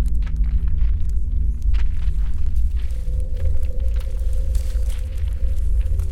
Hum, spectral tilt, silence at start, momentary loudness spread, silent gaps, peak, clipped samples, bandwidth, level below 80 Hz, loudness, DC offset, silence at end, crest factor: none; -7 dB/octave; 0 s; 4 LU; none; -8 dBFS; under 0.1%; 8.6 kHz; -20 dBFS; -25 LUFS; under 0.1%; 0 s; 10 dB